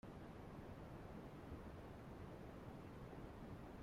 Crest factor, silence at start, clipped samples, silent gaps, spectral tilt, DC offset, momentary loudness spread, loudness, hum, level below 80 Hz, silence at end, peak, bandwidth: 14 dB; 0.05 s; under 0.1%; none; -7.5 dB/octave; under 0.1%; 1 LU; -56 LUFS; none; -64 dBFS; 0 s; -40 dBFS; 16 kHz